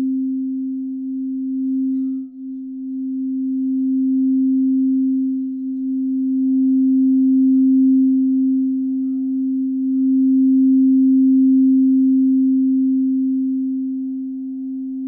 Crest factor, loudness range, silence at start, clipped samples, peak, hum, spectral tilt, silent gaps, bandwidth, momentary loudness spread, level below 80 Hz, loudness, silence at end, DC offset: 8 dB; 7 LU; 0 s; under 0.1%; -10 dBFS; none; -14 dB/octave; none; 0.7 kHz; 12 LU; -72 dBFS; -18 LUFS; 0 s; under 0.1%